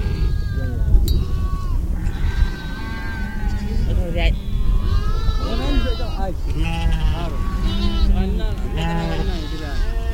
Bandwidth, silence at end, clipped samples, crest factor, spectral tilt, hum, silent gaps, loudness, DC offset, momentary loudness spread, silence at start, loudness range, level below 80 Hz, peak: 15.5 kHz; 0 s; under 0.1%; 18 dB; -6.5 dB/octave; none; none; -23 LUFS; under 0.1%; 6 LU; 0 s; 1 LU; -20 dBFS; -2 dBFS